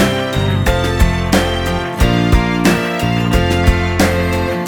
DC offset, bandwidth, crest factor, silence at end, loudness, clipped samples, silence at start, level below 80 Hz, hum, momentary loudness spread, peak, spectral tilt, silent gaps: under 0.1%; 19.5 kHz; 14 dB; 0 s; -15 LUFS; under 0.1%; 0 s; -20 dBFS; none; 3 LU; 0 dBFS; -5.5 dB/octave; none